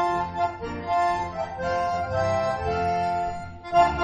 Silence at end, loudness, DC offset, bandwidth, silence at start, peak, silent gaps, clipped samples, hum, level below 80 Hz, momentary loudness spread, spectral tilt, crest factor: 0 s; -26 LUFS; under 0.1%; 9.4 kHz; 0 s; -6 dBFS; none; under 0.1%; none; -46 dBFS; 7 LU; -6 dB/octave; 18 dB